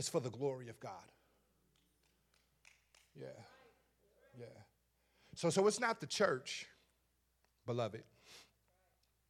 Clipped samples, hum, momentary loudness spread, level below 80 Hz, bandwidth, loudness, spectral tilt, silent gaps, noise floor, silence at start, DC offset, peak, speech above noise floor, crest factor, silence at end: under 0.1%; none; 24 LU; -82 dBFS; 14.5 kHz; -38 LUFS; -4 dB/octave; none; -80 dBFS; 0 s; under 0.1%; -18 dBFS; 41 dB; 26 dB; 0.9 s